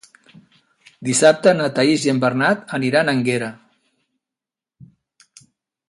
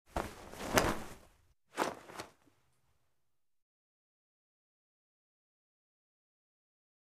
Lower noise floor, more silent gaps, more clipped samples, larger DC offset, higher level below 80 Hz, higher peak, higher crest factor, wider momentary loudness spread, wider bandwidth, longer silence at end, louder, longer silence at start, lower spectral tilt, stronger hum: about the same, -88 dBFS vs -89 dBFS; neither; neither; neither; second, -64 dBFS vs -56 dBFS; first, 0 dBFS vs -4 dBFS; second, 20 dB vs 38 dB; second, 9 LU vs 20 LU; second, 11.5 kHz vs 15.5 kHz; second, 2.35 s vs 4.7 s; first, -17 LUFS vs -37 LUFS; first, 1 s vs 0.1 s; about the same, -4.5 dB/octave vs -3.5 dB/octave; neither